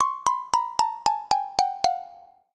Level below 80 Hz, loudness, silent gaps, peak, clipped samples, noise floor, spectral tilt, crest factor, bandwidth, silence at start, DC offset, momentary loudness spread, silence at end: -60 dBFS; -25 LUFS; none; -4 dBFS; under 0.1%; -49 dBFS; -1 dB/octave; 20 dB; 12 kHz; 0 s; under 0.1%; 3 LU; 0.35 s